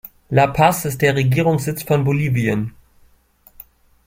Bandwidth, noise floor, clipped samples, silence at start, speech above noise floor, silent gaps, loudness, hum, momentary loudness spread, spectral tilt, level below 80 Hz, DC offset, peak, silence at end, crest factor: 16.5 kHz; -54 dBFS; under 0.1%; 0.3 s; 37 dB; none; -18 LUFS; none; 6 LU; -6 dB/octave; -46 dBFS; under 0.1%; 0 dBFS; 1.35 s; 18 dB